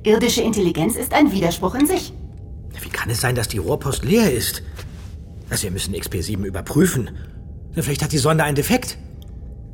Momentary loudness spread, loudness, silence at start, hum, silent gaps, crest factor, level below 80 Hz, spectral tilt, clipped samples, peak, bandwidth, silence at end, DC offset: 20 LU; -20 LUFS; 0 s; none; none; 18 dB; -36 dBFS; -5 dB/octave; under 0.1%; -2 dBFS; 17.5 kHz; 0 s; under 0.1%